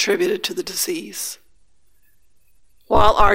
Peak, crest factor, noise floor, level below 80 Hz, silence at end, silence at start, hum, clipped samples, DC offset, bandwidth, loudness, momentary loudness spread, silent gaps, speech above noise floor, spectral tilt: 0 dBFS; 20 dB; -62 dBFS; -32 dBFS; 0 s; 0 s; none; under 0.1%; under 0.1%; 16.5 kHz; -20 LUFS; 13 LU; none; 45 dB; -3 dB/octave